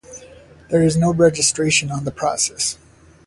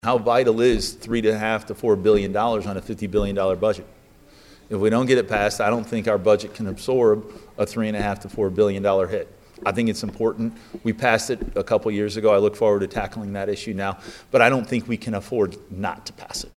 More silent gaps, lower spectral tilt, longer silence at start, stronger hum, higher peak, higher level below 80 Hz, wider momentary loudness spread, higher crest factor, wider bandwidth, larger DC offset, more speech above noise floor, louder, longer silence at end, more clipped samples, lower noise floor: neither; second, -4 dB/octave vs -5.5 dB/octave; about the same, 0.1 s vs 0.05 s; neither; about the same, -2 dBFS vs 0 dBFS; about the same, -48 dBFS vs -44 dBFS; about the same, 10 LU vs 11 LU; about the same, 18 dB vs 22 dB; second, 11.5 kHz vs 15.5 kHz; neither; about the same, 26 dB vs 29 dB; first, -18 LUFS vs -22 LUFS; first, 0.55 s vs 0.05 s; neither; second, -44 dBFS vs -50 dBFS